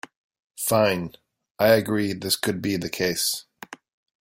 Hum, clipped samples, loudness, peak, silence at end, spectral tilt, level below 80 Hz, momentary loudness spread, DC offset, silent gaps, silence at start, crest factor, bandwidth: none; under 0.1%; -23 LUFS; -4 dBFS; 0.45 s; -4 dB/octave; -60 dBFS; 17 LU; under 0.1%; 1.51-1.55 s; 0.6 s; 22 dB; 16.5 kHz